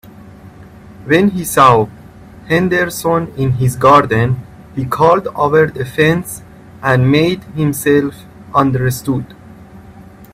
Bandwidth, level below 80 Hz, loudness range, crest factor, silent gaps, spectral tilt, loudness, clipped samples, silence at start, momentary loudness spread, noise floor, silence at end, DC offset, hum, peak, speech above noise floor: 16 kHz; -42 dBFS; 3 LU; 14 dB; none; -6 dB/octave; -13 LUFS; under 0.1%; 0.2 s; 13 LU; -37 dBFS; 0.1 s; under 0.1%; none; 0 dBFS; 25 dB